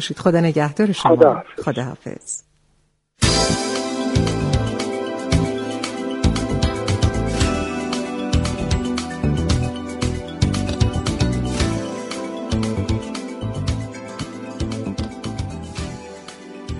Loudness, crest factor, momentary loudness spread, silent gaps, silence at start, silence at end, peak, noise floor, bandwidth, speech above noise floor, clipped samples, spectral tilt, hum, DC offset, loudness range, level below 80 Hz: -21 LUFS; 20 dB; 13 LU; none; 0 s; 0 s; 0 dBFS; -63 dBFS; 11.5 kHz; 45 dB; under 0.1%; -5.5 dB/octave; none; under 0.1%; 6 LU; -30 dBFS